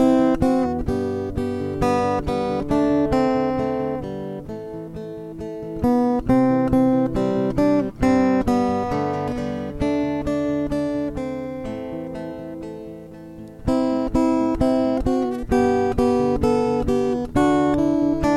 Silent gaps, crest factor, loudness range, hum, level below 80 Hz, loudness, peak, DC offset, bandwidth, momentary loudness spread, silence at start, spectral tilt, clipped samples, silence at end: none; 14 dB; 6 LU; none; -36 dBFS; -21 LUFS; -6 dBFS; under 0.1%; 12 kHz; 14 LU; 0 s; -7.5 dB/octave; under 0.1%; 0 s